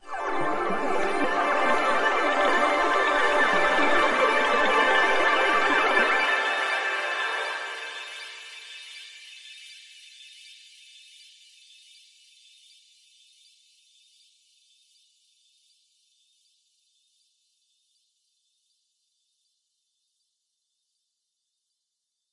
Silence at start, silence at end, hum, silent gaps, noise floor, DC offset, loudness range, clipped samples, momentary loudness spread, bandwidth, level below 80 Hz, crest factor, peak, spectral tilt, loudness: 0.05 s; 11.8 s; none; none; -82 dBFS; under 0.1%; 22 LU; under 0.1%; 22 LU; 11.5 kHz; -60 dBFS; 20 dB; -8 dBFS; -2.5 dB/octave; -23 LUFS